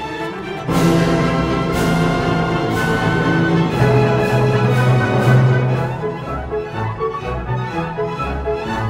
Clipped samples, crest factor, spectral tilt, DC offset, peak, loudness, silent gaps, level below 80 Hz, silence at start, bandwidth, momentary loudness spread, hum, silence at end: under 0.1%; 16 dB; -7 dB/octave; under 0.1%; -2 dBFS; -17 LUFS; none; -34 dBFS; 0 s; 16 kHz; 10 LU; none; 0 s